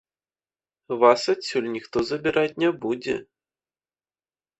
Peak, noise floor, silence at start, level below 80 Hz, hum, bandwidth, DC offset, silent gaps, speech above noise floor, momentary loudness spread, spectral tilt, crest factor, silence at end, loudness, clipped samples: -2 dBFS; under -90 dBFS; 0.9 s; -62 dBFS; none; 8.4 kHz; under 0.1%; none; over 67 dB; 11 LU; -4.5 dB/octave; 22 dB; 1.35 s; -24 LUFS; under 0.1%